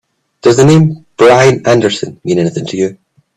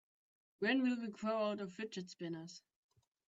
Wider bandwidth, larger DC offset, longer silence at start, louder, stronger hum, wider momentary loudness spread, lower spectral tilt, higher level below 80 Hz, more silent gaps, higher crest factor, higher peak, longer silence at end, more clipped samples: first, 12 kHz vs 7.8 kHz; neither; second, 0.45 s vs 0.6 s; first, -10 LUFS vs -40 LUFS; neither; second, 10 LU vs 13 LU; about the same, -6 dB/octave vs -5.5 dB/octave; first, -46 dBFS vs -86 dBFS; neither; second, 10 dB vs 18 dB; first, 0 dBFS vs -22 dBFS; second, 0.45 s vs 0.7 s; neither